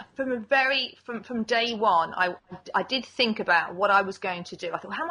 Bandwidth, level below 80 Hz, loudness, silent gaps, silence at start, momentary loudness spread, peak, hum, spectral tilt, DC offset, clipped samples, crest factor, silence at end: 10.5 kHz; -68 dBFS; -25 LUFS; none; 0 s; 11 LU; -8 dBFS; none; -4 dB/octave; under 0.1%; under 0.1%; 18 dB; 0 s